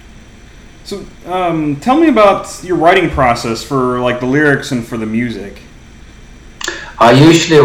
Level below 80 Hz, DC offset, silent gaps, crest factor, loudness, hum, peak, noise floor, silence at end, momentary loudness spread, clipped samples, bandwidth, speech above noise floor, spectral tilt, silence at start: -36 dBFS; under 0.1%; none; 12 dB; -12 LUFS; none; 0 dBFS; -36 dBFS; 0 s; 17 LU; 0.3%; 15.5 kHz; 25 dB; -5.5 dB/octave; 0.85 s